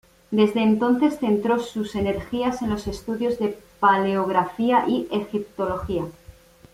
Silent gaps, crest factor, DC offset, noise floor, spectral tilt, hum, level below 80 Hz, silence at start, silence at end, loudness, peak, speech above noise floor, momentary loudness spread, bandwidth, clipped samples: none; 18 dB; under 0.1%; -48 dBFS; -6.5 dB/octave; none; -48 dBFS; 0.3 s; 0.45 s; -23 LUFS; -6 dBFS; 26 dB; 9 LU; 15 kHz; under 0.1%